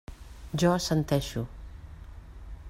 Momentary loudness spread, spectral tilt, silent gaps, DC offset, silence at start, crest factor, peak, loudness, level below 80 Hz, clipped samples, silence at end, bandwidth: 22 LU; -5.5 dB/octave; none; under 0.1%; 0.1 s; 20 dB; -12 dBFS; -28 LUFS; -44 dBFS; under 0.1%; 0 s; 16 kHz